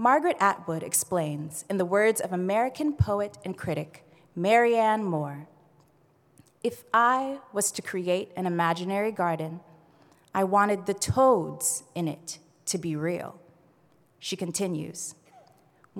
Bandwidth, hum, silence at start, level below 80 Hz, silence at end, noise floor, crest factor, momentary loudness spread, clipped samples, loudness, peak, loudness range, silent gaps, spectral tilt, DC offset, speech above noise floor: 18.5 kHz; none; 0 s; -58 dBFS; 0 s; -63 dBFS; 20 dB; 13 LU; under 0.1%; -27 LUFS; -8 dBFS; 6 LU; none; -4.5 dB/octave; under 0.1%; 37 dB